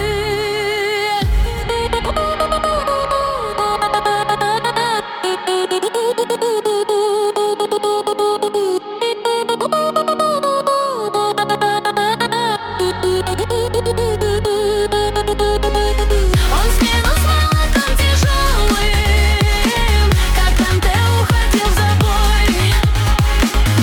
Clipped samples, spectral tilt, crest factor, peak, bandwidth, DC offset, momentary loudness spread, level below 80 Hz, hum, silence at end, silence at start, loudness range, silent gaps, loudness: under 0.1%; -4.5 dB/octave; 14 dB; 0 dBFS; 18 kHz; under 0.1%; 4 LU; -20 dBFS; none; 0 s; 0 s; 3 LU; none; -16 LUFS